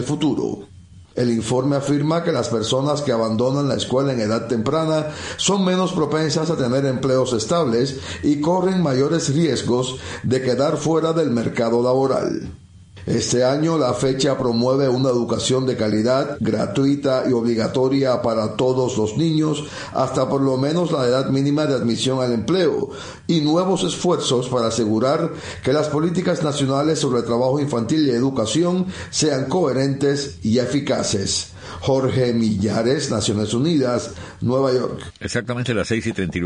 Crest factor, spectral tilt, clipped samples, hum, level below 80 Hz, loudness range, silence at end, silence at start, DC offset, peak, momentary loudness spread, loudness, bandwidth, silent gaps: 14 dB; -5.5 dB/octave; under 0.1%; none; -50 dBFS; 1 LU; 0 s; 0 s; under 0.1%; -6 dBFS; 5 LU; -20 LUFS; 10.5 kHz; none